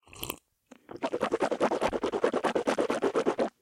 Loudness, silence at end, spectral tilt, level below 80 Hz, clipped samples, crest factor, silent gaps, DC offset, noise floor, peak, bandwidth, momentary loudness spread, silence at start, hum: -30 LUFS; 0.15 s; -4.5 dB/octave; -60 dBFS; under 0.1%; 18 dB; none; under 0.1%; -59 dBFS; -12 dBFS; 16.5 kHz; 10 LU; 0.15 s; none